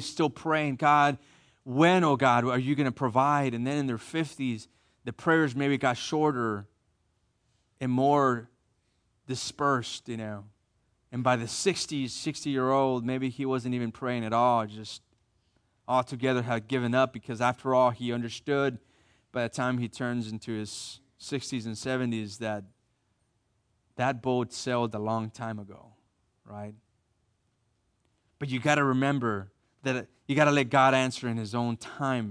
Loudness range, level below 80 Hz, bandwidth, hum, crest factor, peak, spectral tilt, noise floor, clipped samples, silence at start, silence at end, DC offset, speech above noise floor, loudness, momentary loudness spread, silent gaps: 8 LU; -68 dBFS; 10.5 kHz; none; 22 dB; -8 dBFS; -5.5 dB/octave; -74 dBFS; under 0.1%; 0 s; 0 s; under 0.1%; 46 dB; -28 LUFS; 14 LU; none